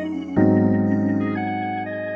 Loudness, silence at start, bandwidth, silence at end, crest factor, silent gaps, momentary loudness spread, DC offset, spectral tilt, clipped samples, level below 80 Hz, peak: -21 LUFS; 0 s; 6 kHz; 0 s; 16 dB; none; 9 LU; under 0.1%; -10 dB/octave; under 0.1%; -52 dBFS; -4 dBFS